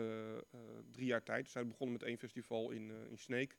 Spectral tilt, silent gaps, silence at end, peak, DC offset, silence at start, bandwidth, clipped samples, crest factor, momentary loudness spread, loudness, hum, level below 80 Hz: -5.5 dB/octave; none; 0.05 s; -24 dBFS; under 0.1%; 0 s; 17 kHz; under 0.1%; 20 dB; 12 LU; -44 LUFS; none; -86 dBFS